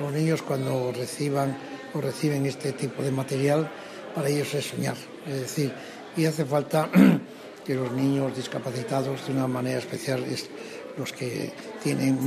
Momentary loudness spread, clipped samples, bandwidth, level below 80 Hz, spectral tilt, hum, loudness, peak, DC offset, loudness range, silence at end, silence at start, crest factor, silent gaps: 10 LU; under 0.1%; 15.5 kHz; -70 dBFS; -6 dB/octave; none; -27 LUFS; -4 dBFS; under 0.1%; 5 LU; 0 s; 0 s; 22 dB; none